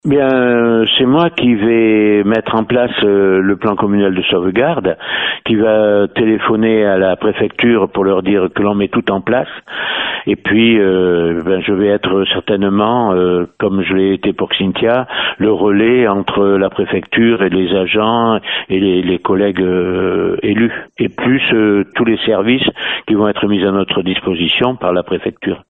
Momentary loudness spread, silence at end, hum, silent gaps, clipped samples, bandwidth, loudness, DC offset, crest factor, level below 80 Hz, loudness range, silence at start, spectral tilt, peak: 5 LU; 0.1 s; none; none; under 0.1%; 4.1 kHz; -13 LUFS; under 0.1%; 12 dB; -46 dBFS; 2 LU; 0.05 s; -9 dB/octave; 0 dBFS